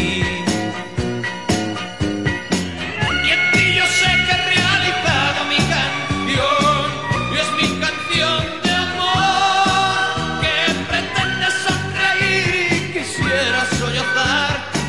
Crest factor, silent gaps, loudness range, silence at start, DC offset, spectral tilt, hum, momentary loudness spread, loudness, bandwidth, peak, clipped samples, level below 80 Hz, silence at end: 16 dB; none; 3 LU; 0 s; 0.7%; -3.5 dB/octave; none; 8 LU; -17 LUFS; 11.5 kHz; -2 dBFS; under 0.1%; -40 dBFS; 0 s